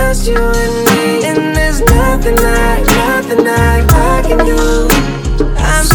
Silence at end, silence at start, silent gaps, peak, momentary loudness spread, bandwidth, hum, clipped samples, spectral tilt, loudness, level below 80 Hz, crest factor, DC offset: 0 s; 0 s; none; 0 dBFS; 3 LU; over 20 kHz; none; 0.8%; -5 dB/octave; -11 LUFS; -14 dBFS; 10 dB; under 0.1%